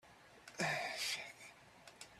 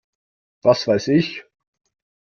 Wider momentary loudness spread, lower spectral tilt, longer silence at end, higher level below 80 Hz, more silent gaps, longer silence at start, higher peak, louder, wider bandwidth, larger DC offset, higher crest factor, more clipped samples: first, 21 LU vs 10 LU; second, -2 dB/octave vs -6 dB/octave; second, 0 s vs 0.8 s; second, -80 dBFS vs -58 dBFS; neither; second, 0.05 s vs 0.65 s; second, -26 dBFS vs -2 dBFS; second, -41 LUFS vs -19 LUFS; first, 15 kHz vs 7 kHz; neither; about the same, 20 dB vs 20 dB; neither